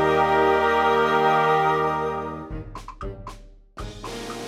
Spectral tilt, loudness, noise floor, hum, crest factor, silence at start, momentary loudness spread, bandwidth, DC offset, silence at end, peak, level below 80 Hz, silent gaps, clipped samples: -5.5 dB/octave; -20 LUFS; -43 dBFS; none; 14 dB; 0 s; 20 LU; 16 kHz; under 0.1%; 0 s; -8 dBFS; -44 dBFS; none; under 0.1%